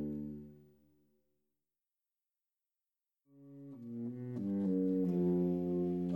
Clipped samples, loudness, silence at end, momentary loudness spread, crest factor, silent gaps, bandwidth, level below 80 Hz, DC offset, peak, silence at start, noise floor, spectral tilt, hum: under 0.1%; -36 LUFS; 0 s; 19 LU; 14 dB; none; 17 kHz; -70 dBFS; under 0.1%; -24 dBFS; 0 s; under -90 dBFS; -11.5 dB/octave; none